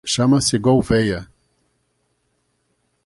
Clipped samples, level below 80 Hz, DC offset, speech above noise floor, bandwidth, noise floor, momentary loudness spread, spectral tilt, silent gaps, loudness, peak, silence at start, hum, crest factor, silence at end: under 0.1%; -44 dBFS; under 0.1%; 51 dB; 11.5 kHz; -68 dBFS; 7 LU; -5 dB/octave; none; -17 LUFS; -2 dBFS; 0.05 s; none; 18 dB; 1.8 s